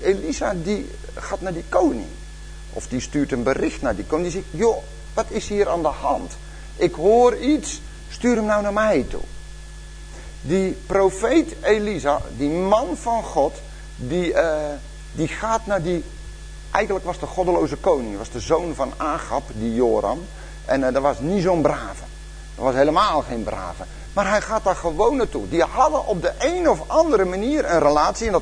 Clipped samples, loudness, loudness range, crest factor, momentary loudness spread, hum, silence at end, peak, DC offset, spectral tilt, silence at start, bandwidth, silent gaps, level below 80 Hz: under 0.1%; -21 LUFS; 4 LU; 20 dB; 18 LU; none; 0 s; -2 dBFS; under 0.1%; -5.5 dB/octave; 0 s; 10.5 kHz; none; -36 dBFS